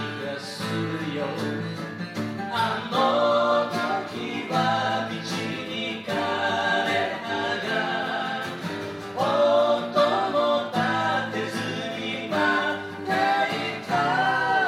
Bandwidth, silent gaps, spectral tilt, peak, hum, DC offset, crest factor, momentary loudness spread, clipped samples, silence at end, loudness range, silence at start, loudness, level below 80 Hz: 15.5 kHz; none; -5 dB/octave; -8 dBFS; none; under 0.1%; 16 dB; 9 LU; under 0.1%; 0 s; 2 LU; 0 s; -25 LUFS; -70 dBFS